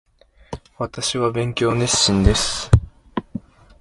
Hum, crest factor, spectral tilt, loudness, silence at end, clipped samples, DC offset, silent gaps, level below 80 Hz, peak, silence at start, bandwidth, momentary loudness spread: none; 20 dB; -4 dB/octave; -19 LUFS; 0.4 s; under 0.1%; under 0.1%; none; -28 dBFS; 0 dBFS; 0.5 s; 11.5 kHz; 20 LU